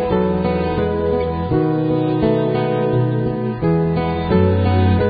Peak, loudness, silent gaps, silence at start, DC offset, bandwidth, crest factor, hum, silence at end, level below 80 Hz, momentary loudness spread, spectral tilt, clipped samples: -4 dBFS; -18 LUFS; none; 0 s; under 0.1%; 5 kHz; 14 dB; none; 0 s; -30 dBFS; 4 LU; -13.5 dB/octave; under 0.1%